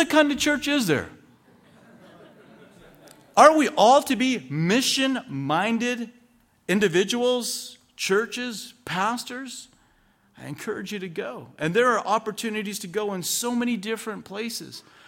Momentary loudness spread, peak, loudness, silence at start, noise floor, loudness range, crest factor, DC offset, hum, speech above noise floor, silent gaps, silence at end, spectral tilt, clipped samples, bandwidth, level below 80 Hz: 18 LU; -2 dBFS; -23 LUFS; 0 s; -62 dBFS; 9 LU; 22 dB; under 0.1%; none; 38 dB; none; 0.3 s; -3.5 dB/octave; under 0.1%; 17 kHz; -64 dBFS